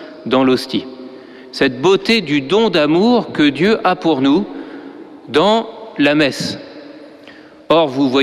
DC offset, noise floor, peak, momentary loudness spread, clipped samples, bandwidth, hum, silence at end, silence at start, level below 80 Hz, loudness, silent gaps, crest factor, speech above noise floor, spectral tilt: under 0.1%; -40 dBFS; -2 dBFS; 19 LU; under 0.1%; 13.5 kHz; none; 0 s; 0 s; -52 dBFS; -15 LUFS; none; 14 dB; 26 dB; -5.5 dB/octave